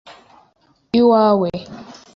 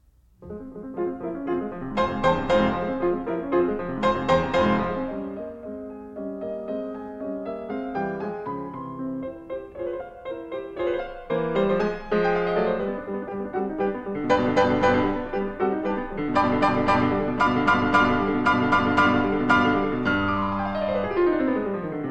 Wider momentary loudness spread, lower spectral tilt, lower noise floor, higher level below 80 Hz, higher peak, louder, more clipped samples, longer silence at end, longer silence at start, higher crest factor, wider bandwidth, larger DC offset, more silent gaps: first, 23 LU vs 14 LU; about the same, -7.5 dB/octave vs -7 dB/octave; first, -58 dBFS vs -48 dBFS; second, -56 dBFS vs -44 dBFS; about the same, -2 dBFS vs -4 dBFS; first, -15 LUFS vs -24 LUFS; neither; first, 0.3 s vs 0 s; second, 0.05 s vs 0.4 s; about the same, 16 dB vs 20 dB; second, 7 kHz vs 9.2 kHz; neither; neither